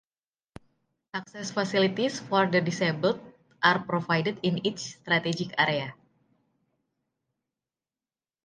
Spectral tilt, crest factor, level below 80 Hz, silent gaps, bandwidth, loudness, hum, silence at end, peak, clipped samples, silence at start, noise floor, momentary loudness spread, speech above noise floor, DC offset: -5 dB/octave; 26 dB; -70 dBFS; none; 9.8 kHz; -27 LUFS; none; 2.5 s; -4 dBFS; under 0.1%; 1.15 s; under -90 dBFS; 12 LU; over 63 dB; under 0.1%